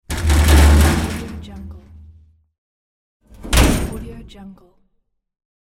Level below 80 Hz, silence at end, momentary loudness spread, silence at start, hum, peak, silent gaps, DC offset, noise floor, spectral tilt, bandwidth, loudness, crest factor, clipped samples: -20 dBFS; 1.1 s; 26 LU; 0.1 s; none; 0 dBFS; 2.58-3.20 s; under 0.1%; -67 dBFS; -5 dB/octave; 16.5 kHz; -15 LUFS; 18 dB; under 0.1%